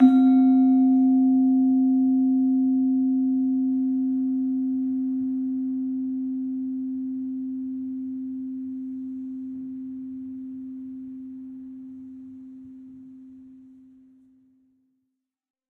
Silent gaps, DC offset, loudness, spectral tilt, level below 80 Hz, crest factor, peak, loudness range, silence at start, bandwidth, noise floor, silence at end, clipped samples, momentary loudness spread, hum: none; under 0.1%; -23 LUFS; -9.5 dB/octave; -72 dBFS; 18 dB; -6 dBFS; 21 LU; 0 s; 4.1 kHz; -80 dBFS; 2.1 s; under 0.1%; 22 LU; none